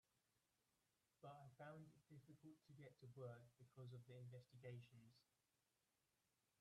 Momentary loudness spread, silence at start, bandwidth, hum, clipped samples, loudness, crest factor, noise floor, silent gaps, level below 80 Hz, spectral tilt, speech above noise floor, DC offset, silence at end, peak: 8 LU; 1.2 s; 12 kHz; none; under 0.1%; -63 LUFS; 18 dB; -90 dBFS; none; under -90 dBFS; -7 dB/octave; 27 dB; under 0.1%; 1.35 s; -46 dBFS